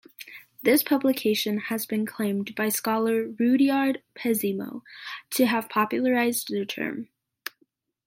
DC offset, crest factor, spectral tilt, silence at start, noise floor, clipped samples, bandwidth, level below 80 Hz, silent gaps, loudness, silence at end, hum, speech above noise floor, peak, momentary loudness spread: under 0.1%; 18 dB; -4 dB/octave; 0.2 s; -69 dBFS; under 0.1%; 17 kHz; -76 dBFS; none; -25 LUFS; 1 s; none; 44 dB; -8 dBFS; 18 LU